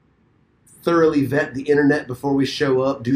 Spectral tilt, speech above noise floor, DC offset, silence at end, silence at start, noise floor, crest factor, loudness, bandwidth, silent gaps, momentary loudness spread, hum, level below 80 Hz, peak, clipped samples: -6.5 dB/octave; 41 dB; under 0.1%; 0 s; 0.85 s; -59 dBFS; 14 dB; -19 LUFS; 15.5 kHz; none; 5 LU; none; -54 dBFS; -4 dBFS; under 0.1%